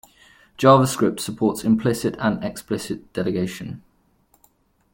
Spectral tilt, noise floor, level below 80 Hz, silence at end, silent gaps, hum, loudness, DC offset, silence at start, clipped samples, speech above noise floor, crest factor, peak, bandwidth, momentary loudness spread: -6 dB/octave; -62 dBFS; -54 dBFS; 1.15 s; none; none; -21 LUFS; under 0.1%; 0.6 s; under 0.1%; 41 dB; 20 dB; -2 dBFS; 17 kHz; 14 LU